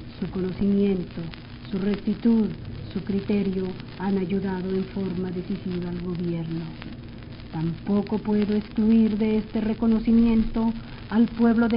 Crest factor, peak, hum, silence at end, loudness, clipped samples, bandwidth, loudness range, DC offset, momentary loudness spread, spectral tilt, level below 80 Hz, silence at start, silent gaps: 16 dB; -8 dBFS; none; 0 s; -25 LUFS; under 0.1%; 5.4 kHz; 7 LU; under 0.1%; 15 LU; -7.5 dB/octave; -42 dBFS; 0 s; none